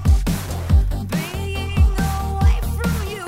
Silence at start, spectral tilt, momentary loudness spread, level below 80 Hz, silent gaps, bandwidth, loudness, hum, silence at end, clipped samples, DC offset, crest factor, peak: 0 s; -6 dB/octave; 6 LU; -20 dBFS; none; 16 kHz; -21 LUFS; none; 0 s; under 0.1%; under 0.1%; 14 dB; -4 dBFS